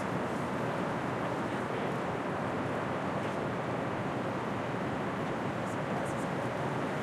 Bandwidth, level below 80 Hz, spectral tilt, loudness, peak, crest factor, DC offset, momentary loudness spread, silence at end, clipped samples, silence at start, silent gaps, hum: 14.5 kHz; -64 dBFS; -6.5 dB/octave; -34 LUFS; -20 dBFS; 12 dB; under 0.1%; 1 LU; 0 s; under 0.1%; 0 s; none; none